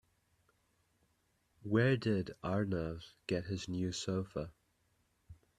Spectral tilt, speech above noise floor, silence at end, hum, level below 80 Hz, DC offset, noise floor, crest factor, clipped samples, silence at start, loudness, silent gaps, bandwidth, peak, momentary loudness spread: -6 dB/octave; 41 dB; 0.25 s; none; -64 dBFS; under 0.1%; -77 dBFS; 22 dB; under 0.1%; 1.6 s; -37 LUFS; none; 12 kHz; -18 dBFS; 13 LU